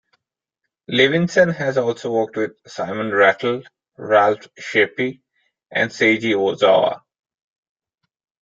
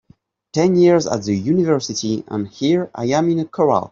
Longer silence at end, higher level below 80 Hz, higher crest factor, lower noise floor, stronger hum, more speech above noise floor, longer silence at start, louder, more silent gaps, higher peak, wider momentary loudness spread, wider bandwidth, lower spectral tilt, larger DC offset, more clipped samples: first, 1.45 s vs 0.05 s; second, -64 dBFS vs -58 dBFS; about the same, 18 dB vs 14 dB; first, -80 dBFS vs -54 dBFS; neither; first, 62 dB vs 37 dB; first, 0.9 s vs 0.55 s; about the same, -18 LUFS vs -18 LUFS; neither; about the same, -2 dBFS vs -2 dBFS; first, 12 LU vs 9 LU; about the same, 7.6 kHz vs 7.6 kHz; about the same, -5 dB/octave vs -6 dB/octave; neither; neither